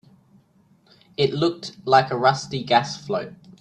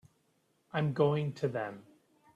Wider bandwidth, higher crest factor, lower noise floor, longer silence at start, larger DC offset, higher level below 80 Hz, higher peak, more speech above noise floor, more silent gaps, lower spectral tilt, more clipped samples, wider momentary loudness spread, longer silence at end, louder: first, 9.8 kHz vs 7.8 kHz; about the same, 22 dB vs 20 dB; second, -59 dBFS vs -74 dBFS; first, 1.2 s vs 0.75 s; neither; first, -62 dBFS vs -72 dBFS; first, -2 dBFS vs -16 dBFS; second, 37 dB vs 42 dB; neither; second, -5 dB/octave vs -8 dB/octave; neither; about the same, 12 LU vs 12 LU; second, 0.25 s vs 0.55 s; first, -22 LUFS vs -33 LUFS